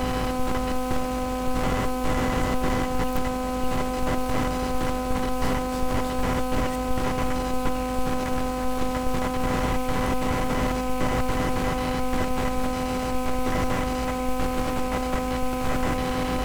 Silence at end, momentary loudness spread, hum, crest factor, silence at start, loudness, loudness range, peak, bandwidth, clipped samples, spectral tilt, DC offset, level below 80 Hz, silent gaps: 0 s; 2 LU; none; 12 dB; 0 s; -27 LUFS; 1 LU; -12 dBFS; over 20 kHz; under 0.1%; -5.5 dB/octave; under 0.1%; -32 dBFS; none